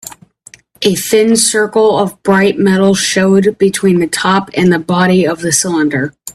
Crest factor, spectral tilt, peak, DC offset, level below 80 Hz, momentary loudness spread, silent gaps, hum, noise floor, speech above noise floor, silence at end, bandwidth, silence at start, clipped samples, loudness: 12 dB; -4.5 dB/octave; 0 dBFS; under 0.1%; -50 dBFS; 4 LU; none; none; -42 dBFS; 31 dB; 0.05 s; 14.5 kHz; 0.05 s; under 0.1%; -11 LUFS